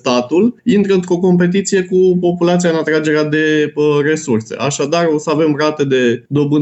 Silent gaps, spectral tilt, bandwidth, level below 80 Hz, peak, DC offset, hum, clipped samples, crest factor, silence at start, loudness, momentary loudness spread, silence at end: none; -5.5 dB/octave; 8.4 kHz; -58 dBFS; -2 dBFS; under 0.1%; none; under 0.1%; 10 dB; 0.05 s; -14 LUFS; 3 LU; 0 s